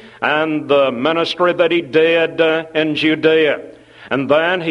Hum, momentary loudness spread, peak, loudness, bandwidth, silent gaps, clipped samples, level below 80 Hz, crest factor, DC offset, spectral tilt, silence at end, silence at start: none; 5 LU; 0 dBFS; -15 LUFS; 10.5 kHz; none; under 0.1%; -60 dBFS; 16 dB; under 0.1%; -6 dB/octave; 0 s; 0.05 s